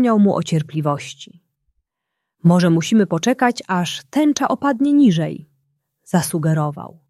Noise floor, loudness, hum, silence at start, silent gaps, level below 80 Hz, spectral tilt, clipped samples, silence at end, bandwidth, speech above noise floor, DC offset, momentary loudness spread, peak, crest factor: -79 dBFS; -18 LUFS; none; 0 s; none; -62 dBFS; -6 dB/octave; under 0.1%; 0.2 s; 13 kHz; 62 dB; under 0.1%; 11 LU; -2 dBFS; 16 dB